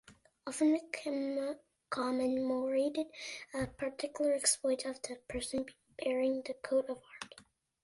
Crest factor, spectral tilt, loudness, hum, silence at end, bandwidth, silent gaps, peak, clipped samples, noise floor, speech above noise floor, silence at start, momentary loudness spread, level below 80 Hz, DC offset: 20 dB; -3 dB/octave; -35 LUFS; none; 0.4 s; 11.5 kHz; none; -16 dBFS; under 0.1%; -64 dBFS; 29 dB; 0.1 s; 13 LU; -66 dBFS; under 0.1%